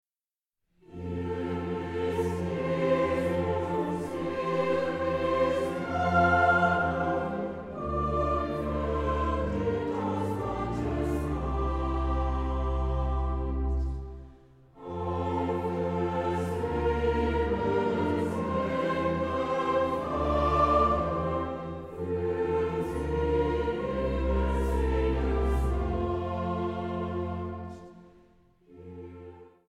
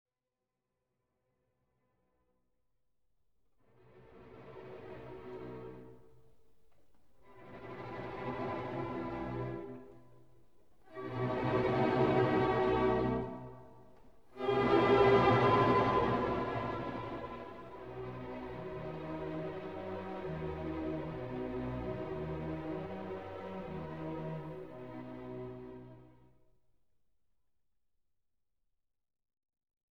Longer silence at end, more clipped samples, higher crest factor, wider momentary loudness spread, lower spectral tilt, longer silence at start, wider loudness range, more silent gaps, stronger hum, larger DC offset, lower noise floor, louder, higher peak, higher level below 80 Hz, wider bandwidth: second, 0.2 s vs 3.8 s; neither; second, 16 dB vs 24 dB; second, 9 LU vs 21 LU; about the same, -8 dB/octave vs -8 dB/octave; second, 0.9 s vs 3.95 s; second, 6 LU vs 21 LU; neither; neither; neither; about the same, under -90 dBFS vs under -90 dBFS; first, -29 LUFS vs -35 LUFS; about the same, -12 dBFS vs -14 dBFS; first, -36 dBFS vs -58 dBFS; first, 11.5 kHz vs 7.4 kHz